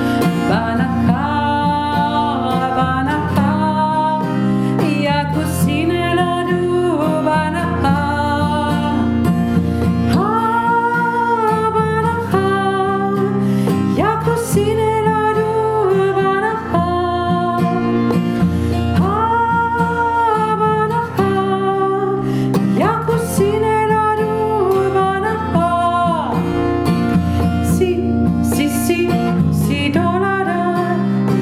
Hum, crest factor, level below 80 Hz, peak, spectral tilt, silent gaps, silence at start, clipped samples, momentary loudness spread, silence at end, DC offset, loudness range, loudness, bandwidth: none; 14 dB; -38 dBFS; -2 dBFS; -6.5 dB/octave; none; 0 s; under 0.1%; 2 LU; 0 s; under 0.1%; 1 LU; -16 LUFS; 15.5 kHz